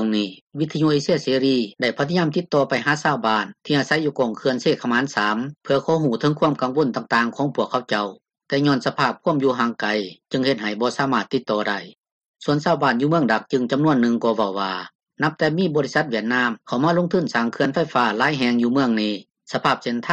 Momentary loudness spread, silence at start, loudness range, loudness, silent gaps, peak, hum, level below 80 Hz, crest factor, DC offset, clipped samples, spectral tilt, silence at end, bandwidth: 6 LU; 0 s; 2 LU; -21 LUFS; 0.41-0.47 s, 12.12-12.21 s, 12.28-12.34 s, 14.95-14.99 s; -4 dBFS; none; -62 dBFS; 16 dB; under 0.1%; under 0.1%; -6 dB/octave; 0 s; 9.2 kHz